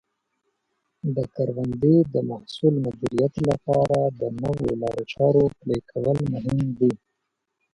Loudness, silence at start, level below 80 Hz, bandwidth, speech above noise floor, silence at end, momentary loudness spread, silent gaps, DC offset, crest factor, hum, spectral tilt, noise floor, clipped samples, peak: -23 LUFS; 1.05 s; -50 dBFS; 11 kHz; 56 dB; 0.75 s; 9 LU; none; under 0.1%; 16 dB; none; -8.5 dB/octave; -79 dBFS; under 0.1%; -6 dBFS